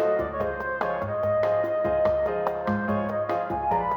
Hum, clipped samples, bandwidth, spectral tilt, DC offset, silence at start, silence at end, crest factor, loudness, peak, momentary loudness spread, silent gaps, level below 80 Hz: none; under 0.1%; 6.2 kHz; -8.5 dB/octave; under 0.1%; 0 s; 0 s; 16 dB; -26 LUFS; -10 dBFS; 4 LU; none; -48 dBFS